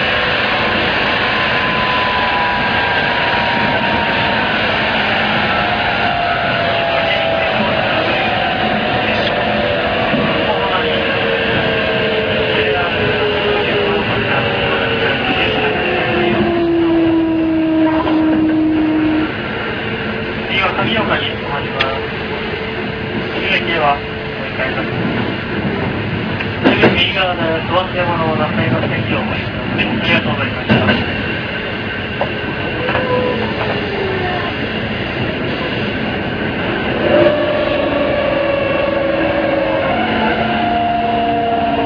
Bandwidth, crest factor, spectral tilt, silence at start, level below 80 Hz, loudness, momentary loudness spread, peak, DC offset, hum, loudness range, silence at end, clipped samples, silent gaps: 5.4 kHz; 16 dB; -7 dB/octave; 0 s; -36 dBFS; -15 LUFS; 6 LU; 0 dBFS; under 0.1%; none; 4 LU; 0 s; under 0.1%; none